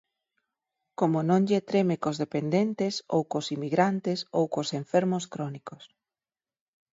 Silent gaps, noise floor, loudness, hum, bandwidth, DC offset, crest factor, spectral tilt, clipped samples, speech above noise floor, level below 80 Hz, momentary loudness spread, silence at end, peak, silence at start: none; under -90 dBFS; -27 LUFS; none; 7.8 kHz; under 0.1%; 20 dB; -6.5 dB/octave; under 0.1%; over 63 dB; -74 dBFS; 11 LU; 1.05 s; -8 dBFS; 1 s